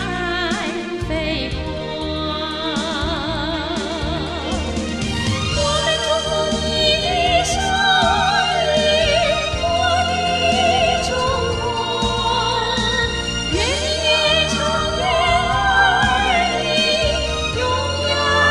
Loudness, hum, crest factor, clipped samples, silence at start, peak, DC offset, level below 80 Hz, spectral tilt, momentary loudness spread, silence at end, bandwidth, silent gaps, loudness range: -18 LUFS; none; 16 dB; under 0.1%; 0 s; -2 dBFS; 0.2%; -32 dBFS; -3.5 dB/octave; 8 LU; 0 s; 13 kHz; none; 6 LU